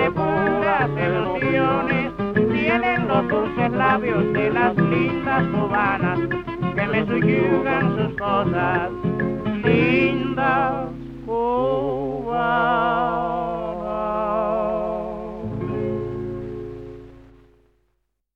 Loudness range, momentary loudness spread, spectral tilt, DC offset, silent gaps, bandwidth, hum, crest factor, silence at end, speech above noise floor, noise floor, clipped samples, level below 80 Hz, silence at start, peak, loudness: 6 LU; 9 LU; -9 dB/octave; under 0.1%; none; 6.2 kHz; none; 18 dB; 1.15 s; 52 dB; -72 dBFS; under 0.1%; -44 dBFS; 0 s; -4 dBFS; -21 LUFS